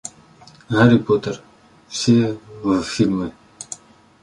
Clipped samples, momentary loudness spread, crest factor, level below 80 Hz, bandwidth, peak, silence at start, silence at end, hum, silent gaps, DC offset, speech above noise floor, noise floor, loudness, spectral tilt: under 0.1%; 20 LU; 20 dB; -52 dBFS; 11 kHz; -2 dBFS; 0.05 s; 0.45 s; none; none; under 0.1%; 30 dB; -47 dBFS; -19 LUFS; -6 dB/octave